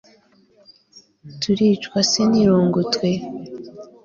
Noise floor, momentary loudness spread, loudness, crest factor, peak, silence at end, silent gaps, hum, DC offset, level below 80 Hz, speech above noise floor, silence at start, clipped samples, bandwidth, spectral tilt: -55 dBFS; 19 LU; -18 LUFS; 16 dB; -4 dBFS; 0.2 s; none; none; under 0.1%; -56 dBFS; 37 dB; 1.25 s; under 0.1%; 7.4 kHz; -5 dB/octave